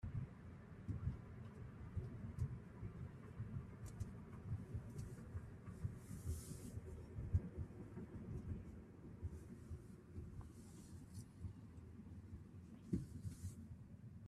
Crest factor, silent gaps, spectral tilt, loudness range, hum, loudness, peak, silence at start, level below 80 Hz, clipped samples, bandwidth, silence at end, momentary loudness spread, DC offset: 24 dB; none; -7.5 dB/octave; 6 LU; none; -52 LUFS; -26 dBFS; 0 s; -60 dBFS; under 0.1%; 14 kHz; 0 s; 10 LU; under 0.1%